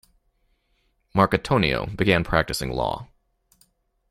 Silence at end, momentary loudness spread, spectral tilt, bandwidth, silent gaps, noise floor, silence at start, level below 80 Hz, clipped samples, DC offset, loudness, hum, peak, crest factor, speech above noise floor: 1.05 s; 7 LU; -5.5 dB/octave; 15.5 kHz; none; -68 dBFS; 1.15 s; -42 dBFS; under 0.1%; under 0.1%; -22 LUFS; none; -4 dBFS; 22 dB; 46 dB